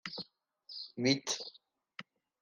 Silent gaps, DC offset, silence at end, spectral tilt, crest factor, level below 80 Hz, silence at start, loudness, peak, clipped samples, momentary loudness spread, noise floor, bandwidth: none; under 0.1%; 0.4 s; -3.5 dB/octave; 24 dB; -84 dBFS; 0.05 s; -35 LUFS; -16 dBFS; under 0.1%; 20 LU; -60 dBFS; 11.5 kHz